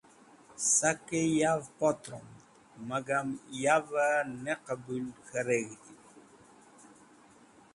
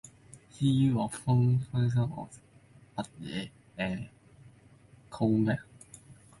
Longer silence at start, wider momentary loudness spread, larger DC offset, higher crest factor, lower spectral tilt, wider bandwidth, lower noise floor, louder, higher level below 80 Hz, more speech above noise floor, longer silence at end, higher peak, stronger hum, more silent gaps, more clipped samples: first, 0.5 s vs 0.35 s; second, 16 LU vs 23 LU; neither; first, 22 dB vs 16 dB; second, -3.5 dB/octave vs -7 dB/octave; about the same, 11.5 kHz vs 11.5 kHz; about the same, -59 dBFS vs -58 dBFS; about the same, -31 LUFS vs -30 LUFS; second, -72 dBFS vs -58 dBFS; about the same, 28 dB vs 29 dB; first, 1.55 s vs 0.25 s; first, -10 dBFS vs -16 dBFS; neither; neither; neither